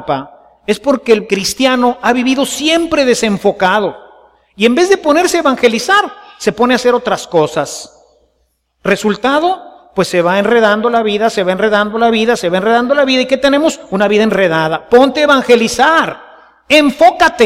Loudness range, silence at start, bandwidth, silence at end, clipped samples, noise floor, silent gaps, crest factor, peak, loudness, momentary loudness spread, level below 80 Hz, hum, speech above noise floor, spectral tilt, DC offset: 4 LU; 0 s; 16 kHz; 0 s; under 0.1%; -61 dBFS; none; 12 dB; 0 dBFS; -12 LUFS; 9 LU; -46 dBFS; none; 50 dB; -4 dB/octave; under 0.1%